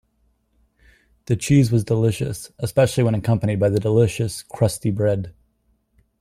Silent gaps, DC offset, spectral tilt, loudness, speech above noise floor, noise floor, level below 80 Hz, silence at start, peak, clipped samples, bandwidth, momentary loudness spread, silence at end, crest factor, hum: none; under 0.1%; -6.5 dB/octave; -20 LUFS; 46 dB; -65 dBFS; -48 dBFS; 1.3 s; -4 dBFS; under 0.1%; 15 kHz; 10 LU; 0.9 s; 16 dB; none